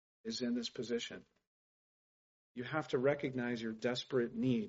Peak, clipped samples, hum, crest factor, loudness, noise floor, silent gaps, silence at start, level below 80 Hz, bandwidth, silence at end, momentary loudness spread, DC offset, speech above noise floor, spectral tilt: -20 dBFS; under 0.1%; none; 18 dB; -38 LUFS; under -90 dBFS; 1.47-2.55 s; 0.25 s; -76 dBFS; 7.6 kHz; 0 s; 11 LU; under 0.1%; over 53 dB; -4.5 dB/octave